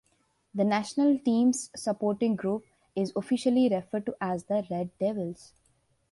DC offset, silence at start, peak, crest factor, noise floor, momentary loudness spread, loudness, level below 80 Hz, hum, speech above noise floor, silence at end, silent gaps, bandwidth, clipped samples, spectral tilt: under 0.1%; 0.55 s; -12 dBFS; 16 dB; -71 dBFS; 11 LU; -28 LUFS; -68 dBFS; none; 43 dB; 0.8 s; none; 11.5 kHz; under 0.1%; -6 dB/octave